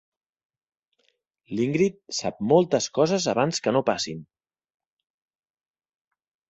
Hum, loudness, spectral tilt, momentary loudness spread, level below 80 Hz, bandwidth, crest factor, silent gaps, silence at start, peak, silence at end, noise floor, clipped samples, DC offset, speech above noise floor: none; -24 LUFS; -5 dB/octave; 9 LU; -64 dBFS; 8.2 kHz; 22 dB; none; 1.5 s; -6 dBFS; 2.25 s; -71 dBFS; under 0.1%; under 0.1%; 48 dB